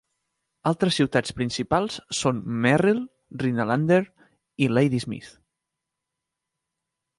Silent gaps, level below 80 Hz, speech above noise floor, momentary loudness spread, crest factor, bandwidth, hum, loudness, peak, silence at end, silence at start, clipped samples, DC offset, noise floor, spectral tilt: none; -56 dBFS; 61 dB; 10 LU; 20 dB; 11.5 kHz; none; -24 LUFS; -6 dBFS; 1.9 s; 0.65 s; under 0.1%; under 0.1%; -84 dBFS; -5.5 dB/octave